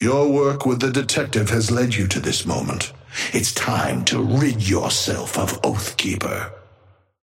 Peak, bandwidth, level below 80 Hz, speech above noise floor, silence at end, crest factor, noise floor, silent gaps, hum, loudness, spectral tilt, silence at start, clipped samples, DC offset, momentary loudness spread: -4 dBFS; 16.5 kHz; -48 dBFS; 34 dB; 0.65 s; 18 dB; -54 dBFS; none; none; -20 LUFS; -4 dB/octave; 0 s; under 0.1%; under 0.1%; 6 LU